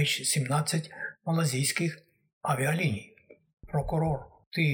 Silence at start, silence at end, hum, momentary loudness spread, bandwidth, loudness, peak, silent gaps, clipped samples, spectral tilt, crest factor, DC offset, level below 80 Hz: 0 s; 0 s; none; 10 LU; over 20 kHz; -29 LUFS; -12 dBFS; 2.33-2.41 s, 3.53-3.57 s, 4.46-4.51 s; under 0.1%; -4.5 dB/octave; 18 dB; under 0.1%; -52 dBFS